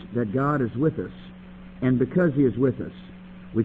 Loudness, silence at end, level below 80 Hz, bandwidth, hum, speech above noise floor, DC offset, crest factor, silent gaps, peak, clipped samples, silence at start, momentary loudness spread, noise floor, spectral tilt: -24 LUFS; 0 s; -50 dBFS; 4.1 kHz; none; 20 dB; under 0.1%; 16 dB; none; -10 dBFS; under 0.1%; 0 s; 22 LU; -43 dBFS; -11 dB/octave